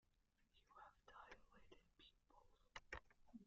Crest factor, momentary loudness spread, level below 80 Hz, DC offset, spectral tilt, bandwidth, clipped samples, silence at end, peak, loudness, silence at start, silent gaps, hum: 28 dB; 10 LU; -76 dBFS; under 0.1%; -2 dB/octave; 7.2 kHz; under 0.1%; 0 s; -38 dBFS; -63 LUFS; 0 s; none; none